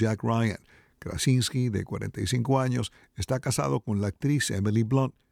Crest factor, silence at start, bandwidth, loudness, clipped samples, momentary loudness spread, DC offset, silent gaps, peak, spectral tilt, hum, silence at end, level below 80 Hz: 16 dB; 0 s; 16 kHz; -27 LUFS; under 0.1%; 10 LU; under 0.1%; none; -12 dBFS; -5.5 dB/octave; none; 0.2 s; -52 dBFS